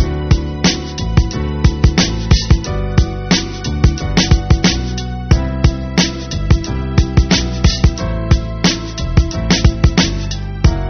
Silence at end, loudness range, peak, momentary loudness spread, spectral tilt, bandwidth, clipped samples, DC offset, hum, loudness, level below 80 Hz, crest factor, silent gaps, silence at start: 0 s; 1 LU; 0 dBFS; 5 LU; -5 dB/octave; 6.6 kHz; under 0.1%; 0.2%; none; -15 LUFS; -18 dBFS; 14 dB; none; 0 s